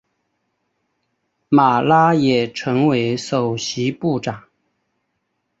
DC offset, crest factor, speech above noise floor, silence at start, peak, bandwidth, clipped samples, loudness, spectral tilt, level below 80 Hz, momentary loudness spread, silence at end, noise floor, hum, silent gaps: under 0.1%; 18 dB; 56 dB; 1.5 s; -2 dBFS; 8 kHz; under 0.1%; -17 LUFS; -6 dB/octave; -58 dBFS; 8 LU; 1.2 s; -72 dBFS; none; none